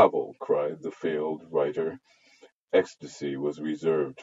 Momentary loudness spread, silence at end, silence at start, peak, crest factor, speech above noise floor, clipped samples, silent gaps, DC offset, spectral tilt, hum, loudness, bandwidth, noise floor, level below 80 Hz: 8 LU; 0 s; 0 s; -6 dBFS; 22 dB; 30 dB; under 0.1%; 2.52-2.67 s; under 0.1%; -6 dB/octave; none; -29 LUFS; 7.8 kHz; -58 dBFS; -78 dBFS